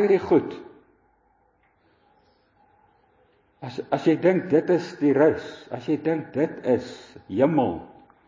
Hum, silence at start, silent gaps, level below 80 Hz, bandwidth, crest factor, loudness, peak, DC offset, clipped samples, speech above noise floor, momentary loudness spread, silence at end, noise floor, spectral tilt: none; 0 s; none; -60 dBFS; 7.6 kHz; 18 dB; -23 LUFS; -6 dBFS; under 0.1%; under 0.1%; 42 dB; 17 LU; 0.4 s; -64 dBFS; -8 dB/octave